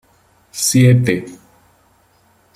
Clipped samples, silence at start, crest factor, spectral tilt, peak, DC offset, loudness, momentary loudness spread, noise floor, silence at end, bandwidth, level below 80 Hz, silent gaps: under 0.1%; 0.55 s; 18 dB; -5 dB/octave; 0 dBFS; under 0.1%; -14 LUFS; 21 LU; -55 dBFS; 1.2 s; 15.5 kHz; -52 dBFS; none